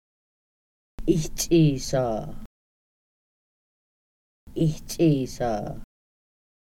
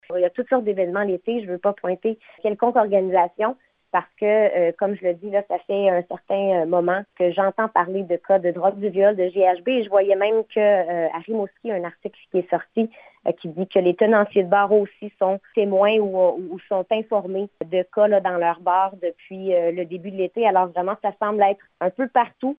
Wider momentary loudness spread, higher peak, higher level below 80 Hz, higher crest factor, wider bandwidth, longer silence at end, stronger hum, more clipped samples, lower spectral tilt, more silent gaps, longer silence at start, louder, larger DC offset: first, 17 LU vs 9 LU; second, -8 dBFS vs -4 dBFS; first, -42 dBFS vs -74 dBFS; about the same, 20 dB vs 16 dB; first, 16.5 kHz vs 3.9 kHz; first, 0.9 s vs 0.05 s; neither; neither; second, -6 dB/octave vs -9.5 dB/octave; first, 2.46-4.47 s vs none; first, 1 s vs 0.1 s; second, -25 LUFS vs -21 LUFS; neither